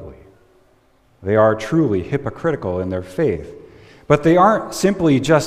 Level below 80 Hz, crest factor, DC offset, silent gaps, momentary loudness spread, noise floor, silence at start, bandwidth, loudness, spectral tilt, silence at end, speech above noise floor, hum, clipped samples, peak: -46 dBFS; 18 dB; under 0.1%; none; 11 LU; -56 dBFS; 0 s; 15 kHz; -17 LUFS; -6.5 dB/octave; 0 s; 39 dB; none; under 0.1%; -2 dBFS